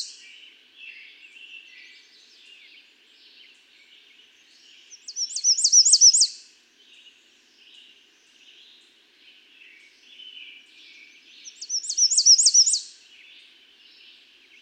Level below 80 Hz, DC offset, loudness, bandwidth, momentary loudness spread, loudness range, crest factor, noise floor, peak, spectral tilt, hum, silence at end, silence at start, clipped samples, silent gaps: under -90 dBFS; under 0.1%; -16 LUFS; 11 kHz; 30 LU; 12 LU; 20 dB; -58 dBFS; -6 dBFS; 7.5 dB/octave; none; 1.75 s; 0 s; under 0.1%; none